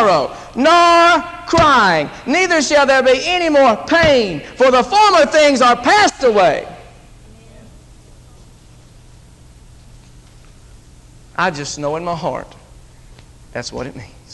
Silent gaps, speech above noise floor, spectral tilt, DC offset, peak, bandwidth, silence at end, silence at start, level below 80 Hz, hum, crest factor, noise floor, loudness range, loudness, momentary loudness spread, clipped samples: none; 29 dB; -3.5 dB/octave; under 0.1%; -2 dBFS; 12 kHz; 0.25 s; 0 s; -42 dBFS; none; 14 dB; -42 dBFS; 13 LU; -13 LUFS; 16 LU; under 0.1%